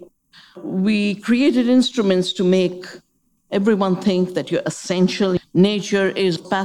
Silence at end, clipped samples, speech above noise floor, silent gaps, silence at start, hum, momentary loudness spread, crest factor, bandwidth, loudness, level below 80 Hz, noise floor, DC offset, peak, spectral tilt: 0 s; under 0.1%; 46 dB; none; 0 s; none; 7 LU; 16 dB; 11.5 kHz; -19 LUFS; -60 dBFS; -64 dBFS; 0.1%; -4 dBFS; -6 dB/octave